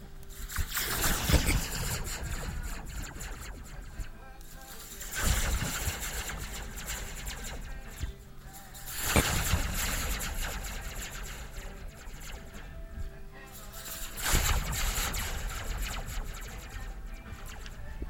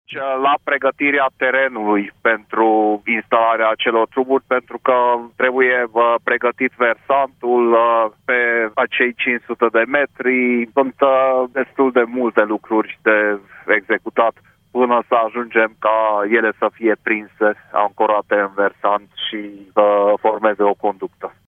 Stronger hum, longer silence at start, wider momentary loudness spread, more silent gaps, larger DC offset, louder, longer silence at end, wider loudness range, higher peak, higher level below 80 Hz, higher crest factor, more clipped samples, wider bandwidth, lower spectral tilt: neither; about the same, 0 s vs 0.1 s; first, 18 LU vs 5 LU; neither; neither; second, -33 LUFS vs -17 LUFS; second, 0 s vs 0.3 s; first, 8 LU vs 2 LU; second, -10 dBFS vs 0 dBFS; first, -38 dBFS vs -66 dBFS; first, 24 dB vs 16 dB; neither; first, 17 kHz vs 3.8 kHz; second, -3 dB/octave vs -7 dB/octave